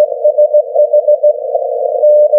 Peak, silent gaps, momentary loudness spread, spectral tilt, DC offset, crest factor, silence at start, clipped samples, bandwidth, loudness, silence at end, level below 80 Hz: -2 dBFS; none; 6 LU; -8 dB/octave; under 0.1%; 8 dB; 0 s; under 0.1%; 0.9 kHz; -11 LUFS; 0 s; -90 dBFS